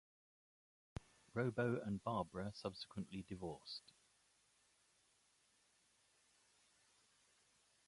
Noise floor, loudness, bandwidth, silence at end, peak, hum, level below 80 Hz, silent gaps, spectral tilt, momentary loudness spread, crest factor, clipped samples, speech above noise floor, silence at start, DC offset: -78 dBFS; -46 LUFS; 11.5 kHz; 4.1 s; -26 dBFS; none; -72 dBFS; none; -6.5 dB/octave; 16 LU; 22 dB; under 0.1%; 33 dB; 1.35 s; under 0.1%